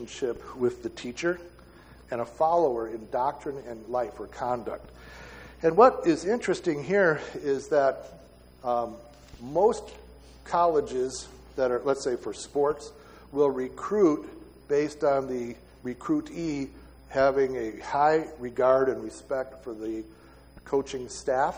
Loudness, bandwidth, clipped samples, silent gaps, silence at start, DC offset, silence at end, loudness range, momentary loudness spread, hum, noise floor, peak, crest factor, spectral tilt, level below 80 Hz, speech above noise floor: -27 LUFS; 16 kHz; under 0.1%; none; 0 s; under 0.1%; 0 s; 5 LU; 15 LU; none; -51 dBFS; -6 dBFS; 22 dB; -5.5 dB/octave; -54 dBFS; 25 dB